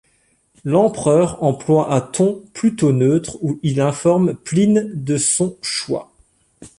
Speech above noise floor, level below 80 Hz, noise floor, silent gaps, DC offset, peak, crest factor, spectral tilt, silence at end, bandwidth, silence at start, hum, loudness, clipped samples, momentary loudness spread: 44 dB; -52 dBFS; -61 dBFS; none; under 0.1%; -4 dBFS; 14 dB; -5.5 dB/octave; 0.1 s; 11.5 kHz; 0.65 s; none; -18 LUFS; under 0.1%; 7 LU